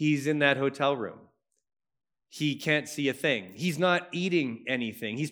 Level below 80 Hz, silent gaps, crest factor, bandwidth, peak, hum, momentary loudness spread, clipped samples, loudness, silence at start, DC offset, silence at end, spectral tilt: -78 dBFS; none; 22 dB; over 20 kHz; -8 dBFS; none; 9 LU; under 0.1%; -28 LUFS; 0 s; under 0.1%; 0 s; -5 dB/octave